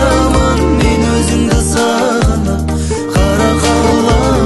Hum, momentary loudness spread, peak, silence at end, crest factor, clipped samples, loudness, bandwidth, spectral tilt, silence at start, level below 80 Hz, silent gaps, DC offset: none; 4 LU; 0 dBFS; 0 s; 10 dB; under 0.1%; -12 LUFS; 12.5 kHz; -5.5 dB/octave; 0 s; -18 dBFS; none; under 0.1%